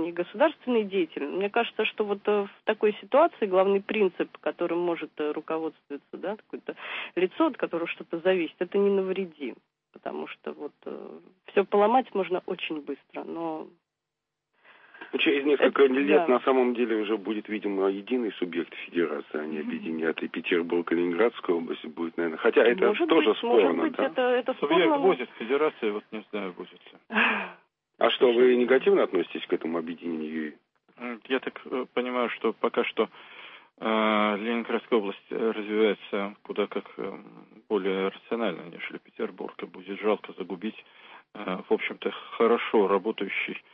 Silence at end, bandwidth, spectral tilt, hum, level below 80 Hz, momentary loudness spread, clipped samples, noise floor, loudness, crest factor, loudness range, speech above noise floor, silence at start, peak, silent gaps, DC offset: 0.15 s; 5 kHz; -9 dB/octave; none; -82 dBFS; 16 LU; under 0.1%; -86 dBFS; -27 LUFS; 20 dB; 7 LU; 59 dB; 0 s; -8 dBFS; none; under 0.1%